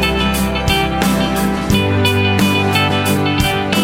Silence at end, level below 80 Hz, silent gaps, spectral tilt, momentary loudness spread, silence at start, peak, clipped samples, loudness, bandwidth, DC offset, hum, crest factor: 0 s; -28 dBFS; none; -5 dB/octave; 2 LU; 0 s; -2 dBFS; under 0.1%; -14 LUFS; 16.5 kHz; under 0.1%; none; 12 dB